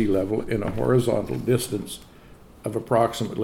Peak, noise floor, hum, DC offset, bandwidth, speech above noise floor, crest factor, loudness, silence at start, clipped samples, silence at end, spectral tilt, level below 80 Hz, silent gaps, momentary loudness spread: -6 dBFS; -48 dBFS; none; under 0.1%; 17 kHz; 24 dB; 18 dB; -24 LUFS; 0 s; under 0.1%; 0 s; -6.5 dB/octave; -46 dBFS; none; 11 LU